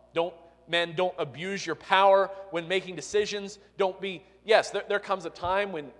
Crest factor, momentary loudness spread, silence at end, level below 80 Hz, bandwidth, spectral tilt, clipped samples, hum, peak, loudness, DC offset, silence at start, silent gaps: 22 dB; 13 LU; 0.05 s; -64 dBFS; 11 kHz; -3.5 dB/octave; under 0.1%; 60 Hz at -65 dBFS; -6 dBFS; -28 LUFS; under 0.1%; 0.15 s; none